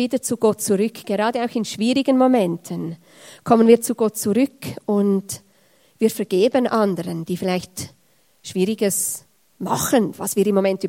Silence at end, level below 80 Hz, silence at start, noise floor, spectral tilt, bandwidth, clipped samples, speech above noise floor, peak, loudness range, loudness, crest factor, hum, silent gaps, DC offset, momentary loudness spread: 0 s; -64 dBFS; 0 s; -61 dBFS; -5 dB/octave; 16.5 kHz; under 0.1%; 41 dB; 0 dBFS; 4 LU; -20 LUFS; 20 dB; none; none; under 0.1%; 16 LU